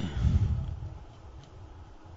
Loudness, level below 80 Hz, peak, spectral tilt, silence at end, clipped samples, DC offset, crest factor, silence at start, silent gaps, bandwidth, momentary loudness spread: -31 LUFS; -36 dBFS; -14 dBFS; -8 dB/octave; 0 s; under 0.1%; under 0.1%; 18 dB; 0 s; none; 7.6 kHz; 22 LU